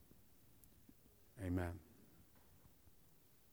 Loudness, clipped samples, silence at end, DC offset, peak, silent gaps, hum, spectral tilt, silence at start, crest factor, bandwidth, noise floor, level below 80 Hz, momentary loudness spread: -46 LUFS; under 0.1%; 1.3 s; under 0.1%; -28 dBFS; none; none; -7.5 dB/octave; 0 s; 24 dB; over 20 kHz; -70 dBFS; -72 dBFS; 24 LU